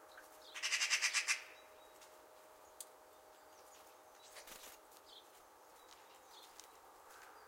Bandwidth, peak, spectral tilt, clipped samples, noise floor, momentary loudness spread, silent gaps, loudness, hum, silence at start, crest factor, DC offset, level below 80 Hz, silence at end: 16.5 kHz; -20 dBFS; 3 dB/octave; under 0.1%; -63 dBFS; 27 LU; none; -37 LUFS; none; 0 s; 26 dB; under 0.1%; -86 dBFS; 0 s